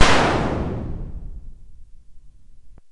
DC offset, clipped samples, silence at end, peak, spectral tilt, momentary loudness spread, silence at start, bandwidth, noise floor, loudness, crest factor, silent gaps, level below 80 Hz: under 0.1%; under 0.1%; 0.2 s; 0 dBFS; -4.5 dB/octave; 23 LU; 0 s; 11.5 kHz; -40 dBFS; -22 LUFS; 20 dB; none; -34 dBFS